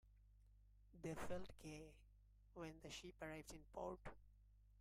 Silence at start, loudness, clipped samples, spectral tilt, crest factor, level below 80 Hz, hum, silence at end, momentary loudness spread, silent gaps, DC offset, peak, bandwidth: 0.05 s; -55 LUFS; under 0.1%; -5 dB/octave; 18 dB; -68 dBFS; 50 Hz at -70 dBFS; 0 s; 8 LU; none; under 0.1%; -36 dBFS; 15.5 kHz